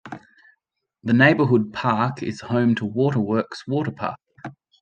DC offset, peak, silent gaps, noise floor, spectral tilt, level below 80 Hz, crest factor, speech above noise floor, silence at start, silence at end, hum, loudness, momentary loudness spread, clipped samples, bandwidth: under 0.1%; -2 dBFS; none; -74 dBFS; -7.5 dB/octave; -64 dBFS; 20 dB; 53 dB; 0.05 s; 0.3 s; none; -21 LUFS; 24 LU; under 0.1%; 8.6 kHz